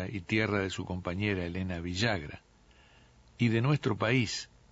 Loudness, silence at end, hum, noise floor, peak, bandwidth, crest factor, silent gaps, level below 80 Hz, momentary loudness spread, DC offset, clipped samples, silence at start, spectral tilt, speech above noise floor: -31 LUFS; 0.25 s; none; -60 dBFS; -14 dBFS; 8 kHz; 18 dB; none; -56 dBFS; 8 LU; under 0.1%; under 0.1%; 0 s; -5.5 dB/octave; 30 dB